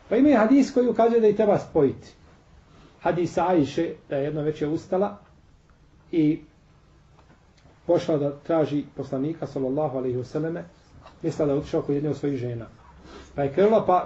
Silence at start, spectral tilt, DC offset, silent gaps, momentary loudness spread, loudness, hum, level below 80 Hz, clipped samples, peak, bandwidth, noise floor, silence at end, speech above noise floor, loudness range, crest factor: 0.1 s; -7.5 dB/octave; under 0.1%; none; 12 LU; -24 LUFS; none; -54 dBFS; under 0.1%; -8 dBFS; 8 kHz; -55 dBFS; 0 s; 33 dB; 6 LU; 16 dB